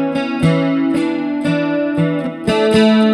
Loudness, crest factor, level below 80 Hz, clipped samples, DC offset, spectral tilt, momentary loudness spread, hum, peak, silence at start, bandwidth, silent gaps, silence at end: -16 LUFS; 14 dB; -46 dBFS; under 0.1%; under 0.1%; -7 dB/octave; 7 LU; none; 0 dBFS; 0 s; 11.5 kHz; none; 0 s